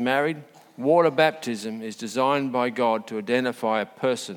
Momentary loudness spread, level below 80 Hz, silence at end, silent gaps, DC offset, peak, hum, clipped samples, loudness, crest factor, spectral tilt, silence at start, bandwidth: 11 LU; -78 dBFS; 0 s; none; under 0.1%; -4 dBFS; none; under 0.1%; -24 LUFS; 20 dB; -5 dB/octave; 0 s; 17.5 kHz